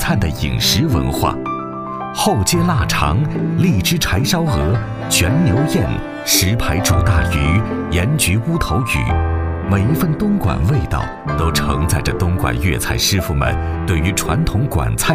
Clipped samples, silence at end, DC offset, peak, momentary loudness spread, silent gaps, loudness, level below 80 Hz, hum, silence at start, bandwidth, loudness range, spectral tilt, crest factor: under 0.1%; 0 s; under 0.1%; 0 dBFS; 5 LU; none; -16 LUFS; -26 dBFS; none; 0 s; 16 kHz; 2 LU; -4.5 dB/octave; 16 dB